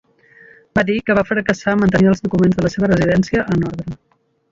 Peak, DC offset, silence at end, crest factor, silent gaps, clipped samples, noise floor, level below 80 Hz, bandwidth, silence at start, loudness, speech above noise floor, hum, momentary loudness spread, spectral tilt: -2 dBFS; under 0.1%; 0.55 s; 16 dB; none; under 0.1%; -47 dBFS; -40 dBFS; 7.6 kHz; 0.75 s; -16 LUFS; 31 dB; none; 9 LU; -7.5 dB/octave